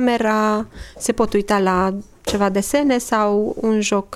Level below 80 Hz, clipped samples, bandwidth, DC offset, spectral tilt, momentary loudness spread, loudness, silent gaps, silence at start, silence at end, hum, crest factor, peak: -42 dBFS; under 0.1%; 15 kHz; under 0.1%; -4.5 dB/octave; 7 LU; -19 LUFS; none; 0 s; 0 s; none; 14 dB; -4 dBFS